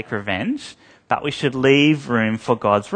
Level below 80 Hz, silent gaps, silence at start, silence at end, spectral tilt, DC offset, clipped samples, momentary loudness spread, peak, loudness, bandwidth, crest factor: -58 dBFS; none; 0 s; 0 s; -6 dB/octave; under 0.1%; under 0.1%; 11 LU; 0 dBFS; -19 LUFS; 9.6 kHz; 18 dB